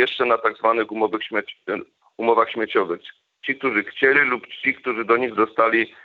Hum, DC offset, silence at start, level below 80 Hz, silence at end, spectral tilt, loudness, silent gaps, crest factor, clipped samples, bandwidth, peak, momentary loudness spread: none; under 0.1%; 0 s; -72 dBFS; 0.15 s; -6.5 dB/octave; -21 LUFS; none; 18 dB; under 0.1%; 5.2 kHz; -2 dBFS; 11 LU